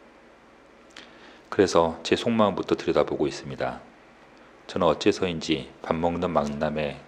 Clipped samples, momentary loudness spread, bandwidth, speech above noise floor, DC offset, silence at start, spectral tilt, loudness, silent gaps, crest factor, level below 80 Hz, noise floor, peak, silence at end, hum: under 0.1%; 10 LU; 10.5 kHz; 28 dB; under 0.1%; 0.95 s; -5.5 dB/octave; -25 LUFS; none; 22 dB; -52 dBFS; -53 dBFS; -6 dBFS; 0.05 s; none